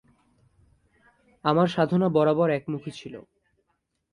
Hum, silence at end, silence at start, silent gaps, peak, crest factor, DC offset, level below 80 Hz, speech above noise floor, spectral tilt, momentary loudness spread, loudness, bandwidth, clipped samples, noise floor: none; 0.9 s; 1.45 s; none; -6 dBFS; 22 dB; under 0.1%; -64 dBFS; 52 dB; -8 dB/octave; 19 LU; -24 LUFS; 10.5 kHz; under 0.1%; -76 dBFS